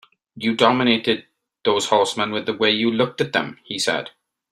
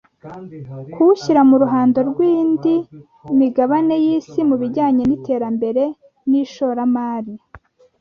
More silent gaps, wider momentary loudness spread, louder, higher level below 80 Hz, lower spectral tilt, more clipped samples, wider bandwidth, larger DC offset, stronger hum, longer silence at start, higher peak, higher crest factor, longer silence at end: neither; second, 9 LU vs 20 LU; second, -20 LUFS vs -17 LUFS; second, -64 dBFS vs -56 dBFS; second, -3.5 dB/octave vs -8 dB/octave; neither; first, 13 kHz vs 7 kHz; neither; neither; about the same, 0.35 s vs 0.25 s; about the same, -2 dBFS vs -2 dBFS; first, 20 dB vs 14 dB; about the same, 0.4 s vs 0.45 s